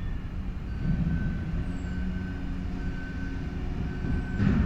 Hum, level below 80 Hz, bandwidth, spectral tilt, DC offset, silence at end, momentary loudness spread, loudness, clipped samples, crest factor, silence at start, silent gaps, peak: none; -34 dBFS; 8.2 kHz; -8.5 dB/octave; under 0.1%; 0 s; 8 LU; -32 LUFS; under 0.1%; 16 dB; 0 s; none; -12 dBFS